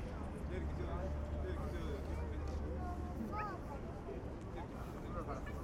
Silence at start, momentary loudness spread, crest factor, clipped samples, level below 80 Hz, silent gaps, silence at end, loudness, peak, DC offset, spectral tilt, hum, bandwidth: 0 s; 5 LU; 12 dB; under 0.1%; -46 dBFS; none; 0 s; -44 LUFS; -30 dBFS; under 0.1%; -7.5 dB/octave; none; 12.5 kHz